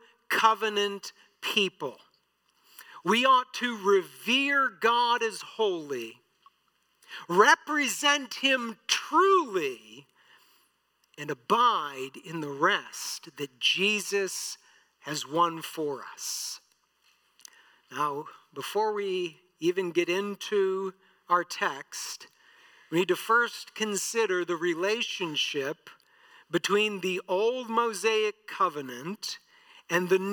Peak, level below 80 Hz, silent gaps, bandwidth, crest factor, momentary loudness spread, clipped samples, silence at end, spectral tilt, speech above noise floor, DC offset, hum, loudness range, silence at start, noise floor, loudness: -6 dBFS; under -90 dBFS; none; 19 kHz; 24 dB; 14 LU; under 0.1%; 0 s; -2.5 dB/octave; 44 dB; under 0.1%; none; 7 LU; 0.3 s; -72 dBFS; -27 LUFS